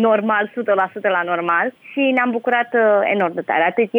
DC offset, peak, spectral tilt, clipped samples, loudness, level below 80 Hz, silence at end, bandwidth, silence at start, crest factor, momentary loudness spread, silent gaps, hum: under 0.1%; -6 dBFS; -7.5 dB/octave; under 0.1%; -18 LUFS; -80 dBFS; 0 s; over 20 kHz; 0 s; 12 dB; 4 LU; none; none